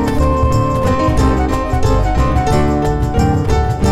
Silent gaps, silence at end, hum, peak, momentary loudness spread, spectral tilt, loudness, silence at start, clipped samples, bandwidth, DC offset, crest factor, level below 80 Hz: none; 0 s; none; -2 dBFS; 2 LU; -7 dB/octave; -15 LUFS; 0 s; under 0.1%; 13.5 kHz; under 0.1%; 10 dB; -18 dBFS